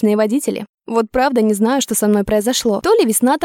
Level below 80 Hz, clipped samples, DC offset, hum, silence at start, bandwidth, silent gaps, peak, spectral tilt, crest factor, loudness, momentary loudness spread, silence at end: -44 dBFS; under 0.1%; under 0.1%; none; 0 s; 17.5 kHz; 0.69-0.78 s; -2 dBFS; -4 dB/octave; 12 dB; -16 LUFS; 6 LU; 0 s